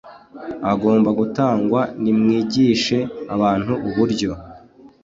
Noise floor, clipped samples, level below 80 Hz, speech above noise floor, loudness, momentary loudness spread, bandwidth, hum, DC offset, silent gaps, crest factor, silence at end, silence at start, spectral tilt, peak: -45 dBFS; under 0.1%; -50 dBFS; 27 dB; -19 LUFS; 10 LU; 7.8 kHz; none; under 0.1%; none; 14 dB; 0.15 s; 0.05 s; -6.5 dB/octave; -4 dBFS